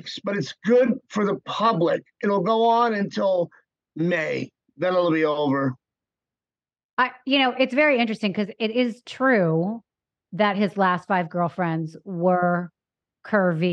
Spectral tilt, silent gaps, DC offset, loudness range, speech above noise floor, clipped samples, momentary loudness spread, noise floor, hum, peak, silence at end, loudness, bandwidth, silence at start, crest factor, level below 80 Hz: -6.5 dB/octave; 6.85-6.97 s; under 0.1%; 3 LU; over 68 dB; under 0.1%; 9 LU; under -90 dBFS; none; -6 dBFS; 0 s; -23 LUFS; 8.8 kHz; 0.05 s; 18 dB; -76 dBFS